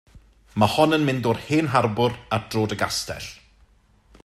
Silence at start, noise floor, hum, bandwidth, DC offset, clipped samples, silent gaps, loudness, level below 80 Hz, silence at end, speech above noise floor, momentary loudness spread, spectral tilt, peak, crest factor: 0.15 s; -57 dBFS; none; 16 kHz; under 0.1%; under 0.1%; none; -22 LUFS; -52 dBFS; 0.9 s; 35 dB; 13 LU; -5.5 dB/octave; -4 dBFS; 20 dB